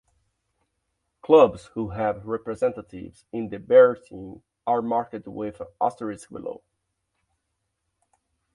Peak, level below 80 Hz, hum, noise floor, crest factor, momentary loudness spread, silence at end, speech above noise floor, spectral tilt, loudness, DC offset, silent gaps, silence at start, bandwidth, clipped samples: -4 dBFS; -58 dBFS; none; -78 dBFS; 22 dB; 24 LU; 2 s; 55 dB; -7 dB/octave; -23 LUFS; under 0.1%; none; 1.25 s; 11 kHz; under 0.1%